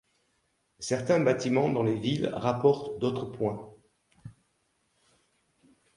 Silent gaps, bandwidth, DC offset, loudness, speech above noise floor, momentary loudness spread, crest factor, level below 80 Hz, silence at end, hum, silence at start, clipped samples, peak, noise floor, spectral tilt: none; 11.5 kHz; under 0.1%; -28 LUFS; 47 dB; 8 LU; 22 dB; -64 dBFS; 1.65 s; none; 0.8 s; under 0.1%; -10 dBFS; -74 dBFS; -6 dB/octave